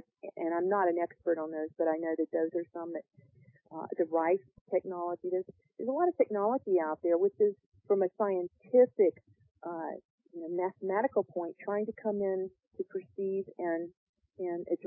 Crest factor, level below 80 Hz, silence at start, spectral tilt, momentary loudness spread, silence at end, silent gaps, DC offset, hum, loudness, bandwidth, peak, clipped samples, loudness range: 18 dB; -80 dBFS; 0.25 s; -12 dB/octave; 13 LU; 0 s; 4.61-4.66 s, 7.66-7.72 s, 9.51-9.55 s, 10.05-10.18 s, 13.97-14.14 s; under 0.1%; none; -32 LUFS; 2.9 kHz; -14 dBFS; under 0.1%; 6 LU